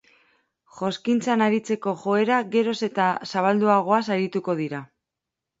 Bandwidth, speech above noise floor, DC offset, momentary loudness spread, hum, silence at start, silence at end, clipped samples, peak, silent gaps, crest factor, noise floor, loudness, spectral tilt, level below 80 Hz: 8 kHz; 63 dB; under 0.1%; 8 LU; none; 0.75 s; 0.75 s; under 0.1%; -6 dBFS; none; 18 dB; -86 dBFS; -23 LUFS; -6 dB/octave; -72 dBFS